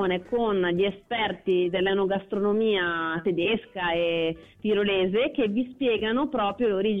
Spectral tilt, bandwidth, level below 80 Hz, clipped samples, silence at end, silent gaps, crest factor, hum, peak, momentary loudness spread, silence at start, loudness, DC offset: -8 dB/octave; 4.4 kHz; -56 dBFS; under 0.1%; 0 s; none; 10 dB; none; -16 dBFS; 4 LU; 0 s; -25 LUFS; under 0.1%